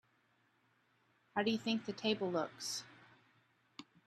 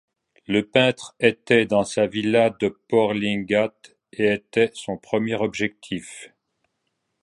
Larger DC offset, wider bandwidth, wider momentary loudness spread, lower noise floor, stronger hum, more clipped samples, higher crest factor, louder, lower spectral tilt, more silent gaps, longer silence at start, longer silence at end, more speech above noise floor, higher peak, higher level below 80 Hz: neither; first, 13.5 kHz vs 11.5 kHz; first, 21 LU vs 13 LU; about the same, -76 dBFS vs -76 dBFS; neither; neither; about the same, 22 dB vs 20 dB; second, -38 LUFS vs -22 LUFS; about the same, -4 dB/octave vs -5 dB/octave; neither; first, 1.35 s vs 0.5 s; second, 0.25 s vs 0.95 s; second, 38 dB vs 54 dB; second, -20 dBFS vs -2 dBFS; second, -84 dBFS vs -60 dBFS